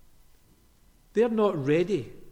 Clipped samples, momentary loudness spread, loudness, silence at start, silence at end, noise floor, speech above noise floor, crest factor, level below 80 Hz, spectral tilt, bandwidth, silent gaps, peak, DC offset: under 0.1%; 8 LU; -26 LUFS; 1.15 s; 0 s; -59 dBFS; 35 dB; 16 dB; -58 dBFS; -7.5 dB/octave; 12.5 kHz; none; -12 dBFS; under 0.1%